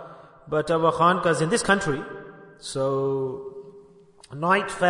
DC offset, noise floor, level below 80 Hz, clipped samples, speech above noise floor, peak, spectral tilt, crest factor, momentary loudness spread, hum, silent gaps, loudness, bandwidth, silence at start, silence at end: under 0.1%; -52 dBFS; -56 dBFS; under 0.1%; 29 dB; -6 dBFS; -4.5 dB/octave; 20 dB; 21 LU; none; none; -23 LUFS; 11 kHz; 0 s; 0 s